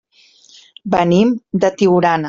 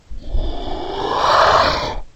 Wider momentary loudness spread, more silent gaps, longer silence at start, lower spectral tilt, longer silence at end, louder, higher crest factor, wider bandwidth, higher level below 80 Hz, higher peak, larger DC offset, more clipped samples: second, 6 LU vs 15 LU; neither; first, 0.85 s vs 0.1 s; first, -7 dB/octave vs -4 dB/octave; about the same, 0 s vs 0.1 s; about the same, -15 LUFS vs -16 LUFS; about the same, 14 dB vs 16 dB; second, 7.6 kHz vs 16.5 kHz; second, -52 dBFS vs -26 dBFS; about the same, -2 dBFS vs 0 dBFS; neither; neither